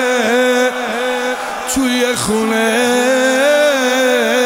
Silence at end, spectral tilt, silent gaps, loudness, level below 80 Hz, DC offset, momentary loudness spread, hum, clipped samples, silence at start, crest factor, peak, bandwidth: 0 s; -2.5 dB/octave; none; -14 LUFS; -48 dBFS; under 0.1%; 7 LU; none; under 0.1%; 0 s; 12 dB; -2 dBFS; 16 kHz